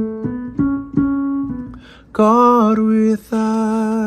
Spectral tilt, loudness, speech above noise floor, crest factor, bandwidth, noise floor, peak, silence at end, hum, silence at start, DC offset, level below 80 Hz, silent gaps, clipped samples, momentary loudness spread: -8 dB/octave; -16 LUFS; 23 dB; 16 dB; 12.5 kHz; -36 dBFS; 0 dBFS; 0 s; none; 0 s; under 0.1%; -44 dBFS; none; under 0.1%; 14 LU